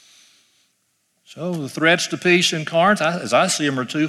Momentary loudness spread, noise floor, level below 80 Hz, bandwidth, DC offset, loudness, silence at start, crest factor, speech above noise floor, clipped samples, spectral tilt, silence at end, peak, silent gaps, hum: 11 LU; -68 dBFS; -70 dBFS; 14 kHz; under 0.1%; -18 LUFS; 1.3 s; 18 dB; 49 dB; under 0.1%; -3.5 dB/octave; 0 s; -4 dBFS; none; none